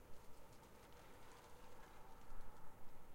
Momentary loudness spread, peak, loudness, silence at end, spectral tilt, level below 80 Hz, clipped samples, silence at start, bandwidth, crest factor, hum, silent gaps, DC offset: 2 LU; -36 dBFS; -64 LUFS; 0 s; -4.5 dB/octave; -62 dBFS; under 0.1%; 0 s; 16 kHz; 14 dB; none; none; under 0.1%